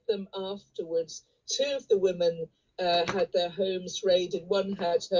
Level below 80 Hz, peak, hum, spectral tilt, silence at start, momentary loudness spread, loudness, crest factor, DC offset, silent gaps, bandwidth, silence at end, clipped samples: -66 dBFS; -14 dBFS; none; -4 dB/octave; 0.1 s; 11 LU; -29 LUFS; 16 dB; under 0.1%; none; 7.6 kHz; 0 s; under 0.1%